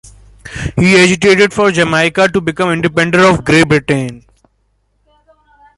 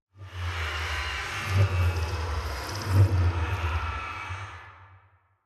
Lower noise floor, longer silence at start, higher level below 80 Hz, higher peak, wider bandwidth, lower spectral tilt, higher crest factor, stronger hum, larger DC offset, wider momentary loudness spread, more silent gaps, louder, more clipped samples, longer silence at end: about the same, -60 dBFS vs -60 dBFS; first, 0.45 s vs 0.15 s; about the same, -38 dBFS vs -40 dBFS; first, 0 dBFS vs -10 dBFS; second, 11.5 kHz vs 13 kHz; about the same, -5 dB/octave vs -5 dB/octave; second, 12 dB vs 18 dB; neither; neither; second, 10 LU vs 14 LU; neither; first, -10 LUFS vs -28 LUFS; neither; first, 1.6 s vs 0.5 s